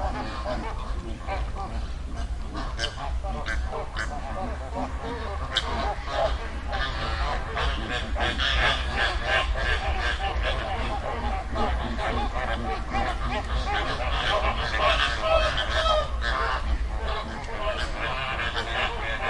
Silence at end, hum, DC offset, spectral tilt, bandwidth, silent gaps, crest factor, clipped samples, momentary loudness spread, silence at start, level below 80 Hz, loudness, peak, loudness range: 0 s; none; under 0.1%; -4.5 dB/octave; 11 kHz; none; 20 dB; under 0.1%; 10 LU; 0 s; -30 dBFS; -28 LUFS; -6 dBFS; 8 LU